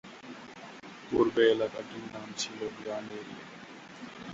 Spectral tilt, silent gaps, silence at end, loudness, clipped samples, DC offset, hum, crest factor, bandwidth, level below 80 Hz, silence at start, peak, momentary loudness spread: -4 dB/octave; none; 0 s; -31 LUFS; under 0.1%; under 0.1%; none; 22 dB; 8 kHz; -68 dBFS; 0.05 s; -12 dBFS; 21 LU